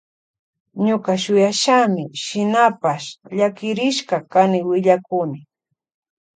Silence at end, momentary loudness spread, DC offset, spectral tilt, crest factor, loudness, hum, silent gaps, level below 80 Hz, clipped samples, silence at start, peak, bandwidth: 0.95 s; 10 LU; under 0.1%; -4.5 dB/octave; 18 dB; -18 LUFS; none; none; -68 dBFS; under 0.1%; 0.75 s; -2 dBFS; 9.4 kHz